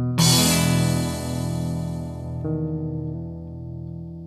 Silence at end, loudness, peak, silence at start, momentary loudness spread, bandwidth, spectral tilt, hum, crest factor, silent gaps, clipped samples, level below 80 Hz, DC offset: 0 s; -23 LUFS; -4 dBFS; 0 s; 18 LU; 16 kHz; -4.5 dB/octave; none; 18 dB; none; under 0.1%; -46 dBFS; under 0.1%